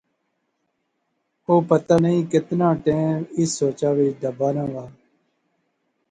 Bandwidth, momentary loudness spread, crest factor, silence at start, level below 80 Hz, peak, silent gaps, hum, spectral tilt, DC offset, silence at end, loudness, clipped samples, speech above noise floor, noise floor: 9.6 kHz; 7 LU; 20 dB; 1.5 s; -58 dBFS; -4 dBFS; none; none; -7 dB/octave; under 0.1%; 1.2 s; -21 LUFS; under 0.1%; 53 dB; -73 dBFS